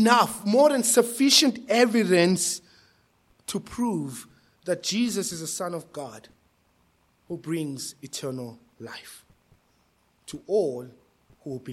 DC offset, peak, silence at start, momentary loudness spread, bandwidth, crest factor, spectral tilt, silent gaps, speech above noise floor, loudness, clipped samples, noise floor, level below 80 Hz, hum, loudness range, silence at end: under 0.1%; -4 dBFS; 0 s; 22 LU; 16.5 kHz; 24 dB; -3.5 dB/octave; none; 42 dB; -24 LUFS; under 0.1%; -66 dBFS; -66 dBFS; none; 15 LU; 0 s